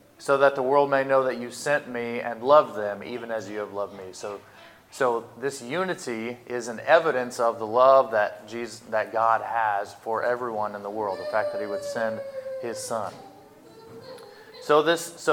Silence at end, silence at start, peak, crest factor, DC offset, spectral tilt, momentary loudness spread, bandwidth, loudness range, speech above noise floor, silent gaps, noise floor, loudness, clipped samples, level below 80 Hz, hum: 0 s; 0.2 s; -4 dBFS; 20 dB; under 0.1%; -4 dB/octave; 16 LU; 17 kHz; 8 LU; 25 dB; none; -49 dBFS; -25 LUFS; under 0.1%; -74 dBFS; none